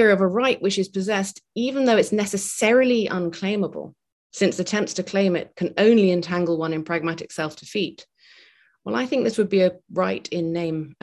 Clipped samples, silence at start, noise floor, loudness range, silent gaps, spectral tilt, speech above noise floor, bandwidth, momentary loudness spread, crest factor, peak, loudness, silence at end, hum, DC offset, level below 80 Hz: under 0.1%; 0 s; -55 dBFS; 4 LU; 4.12-4.30 s; -5 dB/octave; 34 dB; 12.5 kHz; 11 LU; 18 dB; -4 dBFS; -22 LUFS; 0.1 s; none; under 0.1%; -64 dBFS